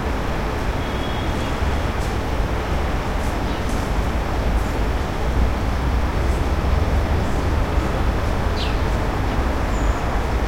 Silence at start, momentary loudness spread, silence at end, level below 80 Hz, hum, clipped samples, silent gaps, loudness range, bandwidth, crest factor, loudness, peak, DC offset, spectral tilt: 0 s; 3 LU; 0 s; -22 dBFS; none; under 0.1%; none; 2 LU; 16 kHz; 14 dB; -23 LUFS; -6 dBFS; 0.2%; -6 dB/octave